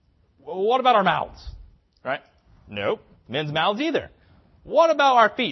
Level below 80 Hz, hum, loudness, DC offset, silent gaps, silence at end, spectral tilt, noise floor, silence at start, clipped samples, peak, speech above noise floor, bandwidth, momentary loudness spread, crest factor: -50 dBFS; none; -22 LUFS; under 0.1%; none; 0 s; -5 dB/octave; -55 dBFS; 0.45 s; under 0.1%; -4 dBFS; 34 dB; 6.2 kHz; 18 LU; 20 dB